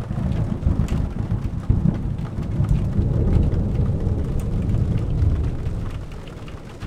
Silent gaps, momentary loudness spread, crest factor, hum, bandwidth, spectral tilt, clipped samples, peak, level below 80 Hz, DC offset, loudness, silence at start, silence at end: none; 10 LU; 16 dB; none; 9.6 kHz; -9 dB/octave; under 0.1%; -4 dBFS; -26 dBFS; under 0.1%; -23 LUFS; 0 s; 0 s